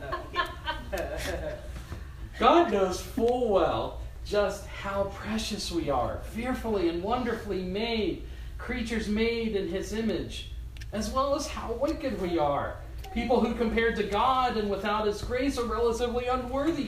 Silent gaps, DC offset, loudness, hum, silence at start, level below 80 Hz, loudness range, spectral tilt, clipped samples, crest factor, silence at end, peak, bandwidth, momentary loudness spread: none; under 0.1%; -29 LUFS; none; 0 s; -42 dBFS; 4 LU; -5 dB/octave; under 0.1%; 22 dB; 0 s; -8 dBFS; 15.5 kHz; 12 LU